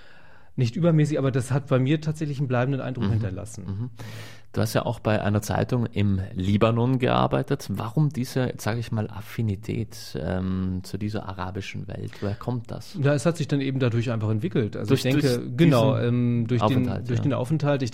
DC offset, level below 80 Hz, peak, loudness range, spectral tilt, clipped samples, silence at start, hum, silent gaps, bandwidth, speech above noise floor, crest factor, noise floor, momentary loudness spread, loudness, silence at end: 0.7%; -52 dBFS; -6 dBFS; 7 LU; -7 dB/octave; under 0.1%; 0.55 s; none; none; 16 kHz; 29 dB; 18 dB; -53 dBFS; 11 LU; -25 LUFS; 0 s